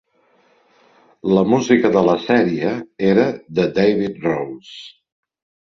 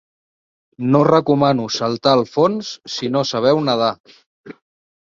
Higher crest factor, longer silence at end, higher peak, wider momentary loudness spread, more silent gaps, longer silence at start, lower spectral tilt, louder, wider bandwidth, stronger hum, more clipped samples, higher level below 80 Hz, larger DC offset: about the same, 18 dB vs 18 dB; first, 0.9 s vs 0.5 s; about the same, -2 dBFS vs 0 dBFS; about the same, 13 LU vs 11 LU; second, none vs 4.00-4.04 s, 4.26-4.44 s; first, 1.25 s vs 0.8 s; about the same, -6.5 dB/octave vs -6 dB/octave; about the same, -17 LUFS vs -17 LUFS; about the same, 7.4 kHz vs 7.6 kHz; neither; neither; about the same, -56 dBFS vs -60 dBFS; neither